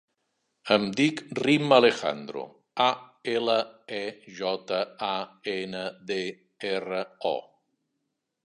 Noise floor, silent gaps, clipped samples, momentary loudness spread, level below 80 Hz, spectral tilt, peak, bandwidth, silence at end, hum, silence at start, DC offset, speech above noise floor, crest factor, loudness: -81 dBFS; none; under 0.1%; 15 LU; -74 dBFS; -5 dB/octave; -4 dBFS; 11 kHz; 1.05 s; none; 0.65 s; under 0.1%; 54 dB; 24 dB; -27 LUFS